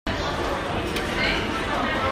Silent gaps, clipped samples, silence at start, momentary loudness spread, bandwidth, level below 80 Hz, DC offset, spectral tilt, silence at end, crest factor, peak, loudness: none; under 0.1%; 0.05 s; 4 LU; 16 kHz; -38 dBFS; under 0.1%; -4.5 dB/octave; 0 s; 16 dB; -10 dBFS; -25 LUFS